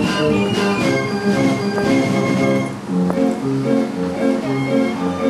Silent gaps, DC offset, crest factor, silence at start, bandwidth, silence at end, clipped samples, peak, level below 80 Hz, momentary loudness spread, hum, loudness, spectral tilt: none; under 0.1%; 14 dB; 0 s; 13.5 kHz; 0 s; under 0.1%; -4 dBFS; -48 dBFS; 3 LU; none; -18 LUFS; -6 dB/octave